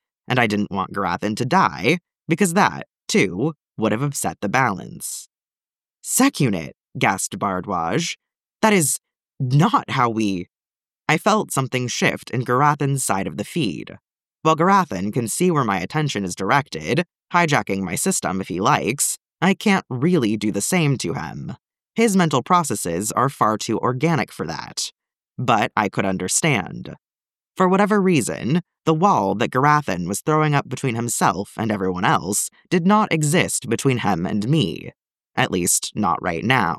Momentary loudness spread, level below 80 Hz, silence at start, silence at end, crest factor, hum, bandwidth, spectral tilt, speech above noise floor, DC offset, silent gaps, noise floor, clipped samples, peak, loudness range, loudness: 10 LU; -58 dBFS; 0.3 s; 0 s; 18 dB; none; 15.5 kHz; -4.5 dB/octave; over 70 dB; under 0.1%; none; under -90 dBFS; under 0.1%; -2 dBFS; 3 LU; -20 LUFS